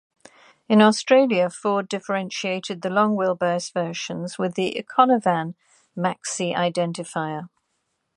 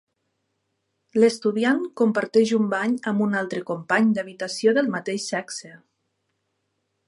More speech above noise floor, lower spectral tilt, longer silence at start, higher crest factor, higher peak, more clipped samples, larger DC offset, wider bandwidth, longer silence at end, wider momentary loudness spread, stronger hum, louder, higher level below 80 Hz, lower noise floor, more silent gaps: about the same, 52 dB vs 53 dB; about the same, -5 dB/octave vs -5 dB/octave; second, 0.7 s vs 1.15 s; about the same, 20 dB vs 18 dB; first, -2 dBFS vs -6 dBFS; neither; neither; about the same, 11 kHz vs 11.5 kHz; second, 0.7 s vs 1.3 s; about the same, 11 LU vs 9 LU; neither; about the same, -22 LUFS vs -23 LUFS; about the same, -72 dBFS vs -76 dBFS; about the same, -74 dBFS vs -75 dBFS; neither